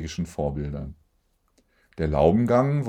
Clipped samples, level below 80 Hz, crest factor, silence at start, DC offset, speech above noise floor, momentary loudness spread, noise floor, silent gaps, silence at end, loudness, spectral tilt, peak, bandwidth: under 0.1%; -42 dBFS; 20 dB; 0 s; under 0.1%; 45 dB; 15 LU; -68 dBFS; none; 0 s; -24 LUFS; -8 dB/octave; -6 dBFS; 10.5 kHz